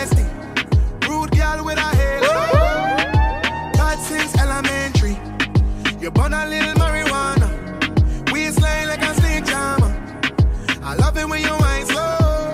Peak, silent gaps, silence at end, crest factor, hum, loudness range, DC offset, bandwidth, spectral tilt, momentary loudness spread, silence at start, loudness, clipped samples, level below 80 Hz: -2 dBFS; none; 0 s; 16 dB; none; 1 LU; under 0.1%; 15.5 kHz; -5 dB/octave; 4 LU; 0 s; -18 LUFS; under 0.1%; -22 dBFS